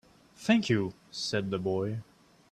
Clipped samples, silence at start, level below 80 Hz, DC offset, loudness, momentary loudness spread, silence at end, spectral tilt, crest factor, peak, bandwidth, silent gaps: under 0.1%; 0.4 s; -66 dBFS; under 0.1%; -30 LUFS; 11 LU; 0.5 s; -5.5 dB/octave; 20 dB; -12 dBFS; 12.5 kHz; none